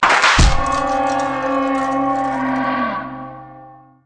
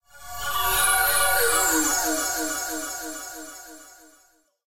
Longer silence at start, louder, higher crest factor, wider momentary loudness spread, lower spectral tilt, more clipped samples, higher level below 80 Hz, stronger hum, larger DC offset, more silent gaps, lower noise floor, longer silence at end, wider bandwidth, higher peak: about the same, 0 s vs 0 s; first, -17 LUFS vs -22 LUFS; about the same, 16 dB vs 18 dB; second, 17 LU vs 20 LU; first, -4 dB/octave vs -0.5 dB/octave; neither; first, -26 dBFS vs -48 dBFS; neither; neither; neither; second, -42 dBFS vs -62 dBFS; first, 0.3 s vs 0 s; second, 10.5 kHz vs 16.5 kHz; first, -2 dBFS vs -8 dBFS